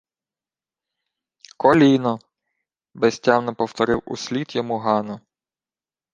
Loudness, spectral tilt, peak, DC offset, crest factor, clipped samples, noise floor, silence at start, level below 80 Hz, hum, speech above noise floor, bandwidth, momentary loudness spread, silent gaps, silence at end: -20 LUFS; -6 dB/octave; -2 dBFS; under 0.1%; 20 dB; under 0.1%; under -90 dBFS; 1.6 s; -56 dBFS; none; over 71 dB; 9 kHz; 12 LU; none; 0.95 s